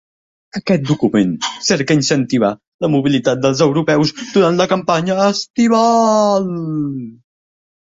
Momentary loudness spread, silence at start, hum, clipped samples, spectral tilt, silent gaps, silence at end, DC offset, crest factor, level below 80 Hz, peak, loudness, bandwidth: 9 LU; 0.55 s; none; under 0.1%; -5 dB/octave; 2.67-2.79 s, 5.50-5.54 s; 0.75 s; under 0.1%; 16 dB; -54 dBFS; 0 dBFS; -15 LUFS; 8 kHz